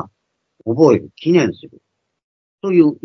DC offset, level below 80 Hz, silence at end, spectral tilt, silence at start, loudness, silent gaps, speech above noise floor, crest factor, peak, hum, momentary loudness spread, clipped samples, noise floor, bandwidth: under 0.1%; -64 dBFS; 0.1 s; -7.5 dB/octave; 0 s; -15 LUFS; 2.23-2.58 s; 56 dB; 16 dB; 0 dBFS; none; 18 LU; under 0.1%; -71 dBFS; 6.4 kHz